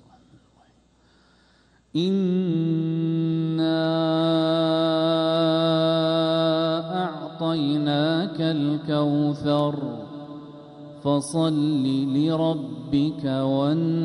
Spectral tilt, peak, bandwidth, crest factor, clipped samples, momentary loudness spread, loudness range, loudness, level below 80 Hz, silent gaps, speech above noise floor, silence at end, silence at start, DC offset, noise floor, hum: -7 dB/octave; -10 dBFS; 11.5 kHz; 12 dB; under 0.1%; 9 LU; 4 LU; -23 LUFS; -62 dBFS; none; 37 dB; 0 s; 1.95 s; under 0.1%; -59 dBFS; none